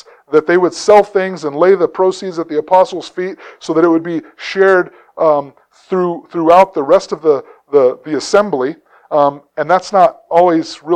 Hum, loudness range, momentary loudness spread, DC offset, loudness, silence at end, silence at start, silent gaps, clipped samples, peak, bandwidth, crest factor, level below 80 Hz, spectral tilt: none; 2 LU; 12 LU; under 0.1%; -13 LUFS; 0 s; 0.3 s; none; 0.2%; 0 dBFS; 9.8 kHz; 14 dB; -58 dBFS; -5.5 dB/octave